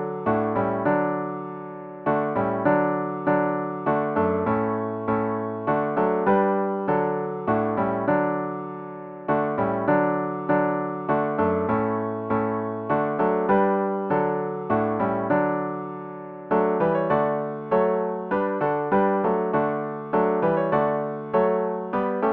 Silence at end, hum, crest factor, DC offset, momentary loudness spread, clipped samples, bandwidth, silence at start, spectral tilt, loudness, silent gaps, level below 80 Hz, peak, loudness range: 0 s; none; 16 dB; under 0.1%; 7 LU; under 0.1%; 4.5 kHz; 0 s; -11 dB/octave; -24 LUFS; none; -58 dBFS; -8 dBFS; 1 LU